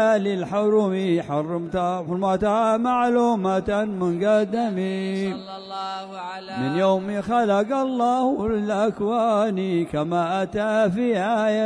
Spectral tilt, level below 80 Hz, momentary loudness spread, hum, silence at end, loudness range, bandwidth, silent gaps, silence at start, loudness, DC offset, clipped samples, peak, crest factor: -7 dB/octave; -52 dBFS; 8 LU; none; 0 s; 3 LU; 10.5 kHz; none; 0 s; -22 LUFS; under 0.1%; under 0.1%; -10 dBFS; 12 dB